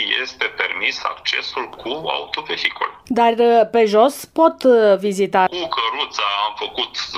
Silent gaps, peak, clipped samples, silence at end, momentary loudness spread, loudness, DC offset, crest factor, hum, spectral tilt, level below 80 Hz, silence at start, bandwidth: none; 0 dBFS; under 0.1%; 0 s; 10 LU; -18 LUFS; under 0.1%; 18 dB; none; -3.5 dB/octave; -60 dBFS; 0 s; 15.5 kHz